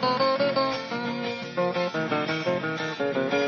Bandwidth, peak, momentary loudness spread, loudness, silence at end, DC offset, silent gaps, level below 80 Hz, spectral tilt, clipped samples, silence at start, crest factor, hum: 6.8 kHz; -12 dBFS; 7 LU; -27 LUFS; 0 s; under 0.1%; none; -66 dBFS; -3 dB/octave; under 0.1%; 0 s; 14 dB; none